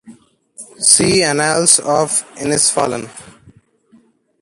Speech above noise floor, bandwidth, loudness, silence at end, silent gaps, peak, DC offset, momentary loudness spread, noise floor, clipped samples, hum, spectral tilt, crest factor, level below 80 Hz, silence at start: 37 dB; 16 kHz; -13 LUFS; 1.2 s; none; 0 dBFS; under 0.1%; 10 LU; -52 dBFS; under 0.1%; none; -2 dB/octave; 18 dB; -50 dBFS; 0.05 s